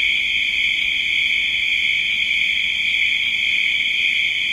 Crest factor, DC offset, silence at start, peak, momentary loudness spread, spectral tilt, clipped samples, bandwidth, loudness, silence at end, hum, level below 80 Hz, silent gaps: 12 dB; under 0.1%; 0 s; -6 dBFS; 1 LU; 1 dB/octave; under 0.1%; 16.5 kHz; -16 LUFS; 0 s; none; -50 dBFS; none